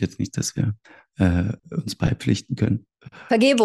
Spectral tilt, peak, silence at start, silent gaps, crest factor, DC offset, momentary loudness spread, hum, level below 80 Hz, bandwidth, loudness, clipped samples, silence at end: -6 dB/octave; -6 dBFS; 0 s; none; 16 dB; under 0.1%; 10 LU; none; -44 dBFS; 12.5 kHz; -24 LUFS; under 0.1%; 0 s